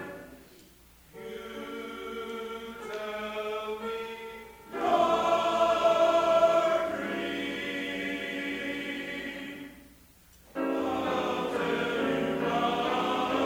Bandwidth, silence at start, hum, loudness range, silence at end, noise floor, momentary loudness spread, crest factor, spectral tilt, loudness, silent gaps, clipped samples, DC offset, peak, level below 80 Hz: over 20 kHz; 0 s; none; 11 LU; 0 s; -57 dBFS; 18 LU; 18 dB; -4.5 dB/octave; -29 LUFS; none; under 0.1%; under 0.1%; -12 dBFS; -62 dBFS